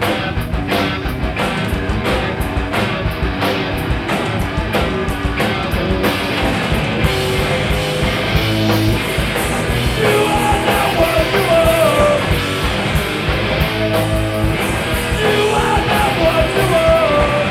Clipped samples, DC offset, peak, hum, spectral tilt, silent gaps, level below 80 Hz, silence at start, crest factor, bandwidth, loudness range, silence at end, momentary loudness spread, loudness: under 0.1%; under 0.1%; -2 dBFS; none; -5 dB/octave; none; -26 dBFS; 0 s; 14 dB; 16.5 kHz; 4 LU; 0 s; 6 LU; -16 LUFS